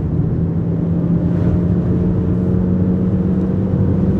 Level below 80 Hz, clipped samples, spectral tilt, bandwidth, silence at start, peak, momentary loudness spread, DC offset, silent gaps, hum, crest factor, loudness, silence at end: -30 dBFS; under 0.1%; -12 dB/octave; 3.3 kHz; 0 s; -4 dBFS; 2 LU; under 0.1%; none; none; 12 dB; -17 LUFS; 0 s